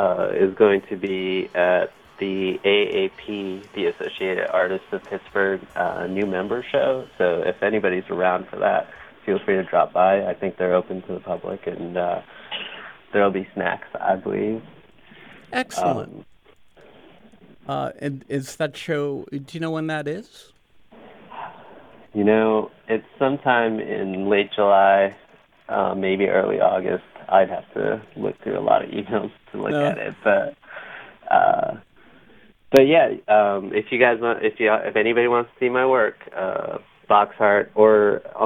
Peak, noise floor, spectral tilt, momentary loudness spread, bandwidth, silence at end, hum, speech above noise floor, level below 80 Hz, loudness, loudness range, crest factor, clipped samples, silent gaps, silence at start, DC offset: 0 dBFS; -53 dBFS; -6 dB/octave; 13 LU; 15 kHz; 0 s; none; 33 dB; -62 dBFS; -21 LUFS; 9 LU; 22 dB; under 0.1%; none; 0 s; under 0.1%